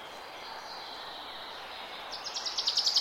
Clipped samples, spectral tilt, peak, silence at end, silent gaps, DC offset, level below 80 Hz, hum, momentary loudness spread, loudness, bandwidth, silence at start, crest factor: under 0.1%; 1 dB/octave; -14 dBFS; 0 s; none; under 0.1%; -70 dBFS; none; 15 LU; -34 LUFS; 16 kHz; 0 s; 22 dB